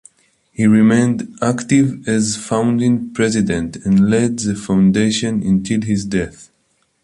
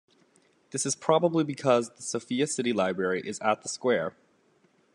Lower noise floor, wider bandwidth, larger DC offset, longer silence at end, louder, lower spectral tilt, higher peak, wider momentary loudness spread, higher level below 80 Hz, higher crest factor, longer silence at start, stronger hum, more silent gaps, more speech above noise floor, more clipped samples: about the same, -63 dBFS vs -66 dBFS; about the same, 11.5 kHz vs 12.5 kHz; neither; second, 0.6 s vs 0.85 s; first, -16 LUFS vs -28 LUFS; first, -5.5 dB/octave vs -4 dB/octave; first, -2 dBFS vs -6 dBFS; about the same, 7 LU vs 8 LU; first, -44 dBFS vs -76 dBFS; second, 14 dB vs 22 dB; about the same, 0.6 s vs 0.7 s; neither; neither; first, 48 dB vs 39 dB; neither